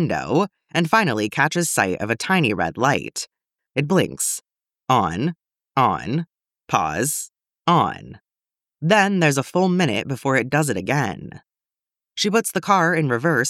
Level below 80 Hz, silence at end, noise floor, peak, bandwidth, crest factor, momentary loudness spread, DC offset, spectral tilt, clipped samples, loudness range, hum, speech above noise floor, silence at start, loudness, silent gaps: -56 dBFS; 0 s; under -90 dBFS; -2 dBFS; 16 kHz; 20 dB; 10 LU; under 0.1%; -4.5 dB/octave; under 0.1%; 3 LU; none; over 70 dB; 0 s; -20 LUFS; none